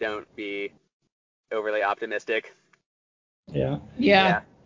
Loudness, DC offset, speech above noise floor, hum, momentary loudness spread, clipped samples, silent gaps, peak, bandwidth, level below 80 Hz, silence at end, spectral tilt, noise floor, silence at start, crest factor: -25 LUFS; under 0.1%; over 65 dB; none; 15 LU; under 0.1%; 0.93-1.00 s, 1.12-1.44 s, 2.86-3.43 s; -6 dBFS; 7.6 kHz; -56 dBFS; 0.25 s; -6.5 dB/octave; under -90 dBFS; 0 s; 22 dB